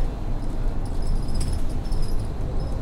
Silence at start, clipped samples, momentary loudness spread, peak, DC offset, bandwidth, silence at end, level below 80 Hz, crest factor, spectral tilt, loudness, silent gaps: 0 s; under 0.1%; 2 LU; -12 dBFS; under 0.1%; 11.5 kHz; 0 s; -24 dBFS; 10 dB; -6.5 dB/octave; -30 LUFS; none